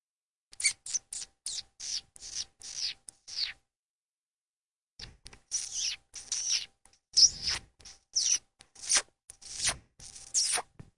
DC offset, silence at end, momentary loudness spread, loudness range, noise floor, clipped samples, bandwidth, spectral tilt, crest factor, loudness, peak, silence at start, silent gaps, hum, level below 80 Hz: under 0.1%; 0.35 s; 19 LU; 11 LU; under -90 dBFS; under 0.1%; 11.5 kHz; 2 dB/octave; 26 dB; -30 LUFS; -10 dBFS; 0.6 s; 3.76-4.97 s; none; -62 dBFS